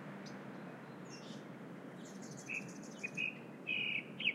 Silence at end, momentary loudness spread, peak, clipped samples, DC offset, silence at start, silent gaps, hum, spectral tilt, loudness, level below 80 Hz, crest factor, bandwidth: 0 s; 14 LU; -22 dBFS; under 0.1%; under 0.1%; 0 s; none; none; -3.5 dB/octave; -43 LUFS; under -90 dBFS; 22 dB; 16 kHz